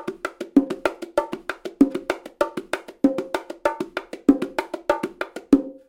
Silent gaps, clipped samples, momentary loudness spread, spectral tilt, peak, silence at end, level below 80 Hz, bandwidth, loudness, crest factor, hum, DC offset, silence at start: none; under 0.1%; 11 LU; -5.5 dB/octave; -2 dBFS; 0.15 s; -52 dBFS; 16.5 kHz; -24 LUFS; 22 dB; none; under 0.1%; 0 s